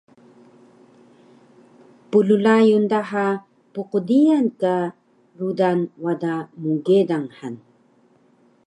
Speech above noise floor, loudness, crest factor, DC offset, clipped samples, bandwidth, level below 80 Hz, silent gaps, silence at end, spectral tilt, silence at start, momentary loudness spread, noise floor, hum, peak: 38 dB; -20 LUFS; 18 dB; under 0.1%; under 0.1%; 10 kHz; -76 dBFS; none; 1.1 s; -7.5 dB/octave; 2.1 s; 15 LU; -57 dBFS; none; -4 dBFS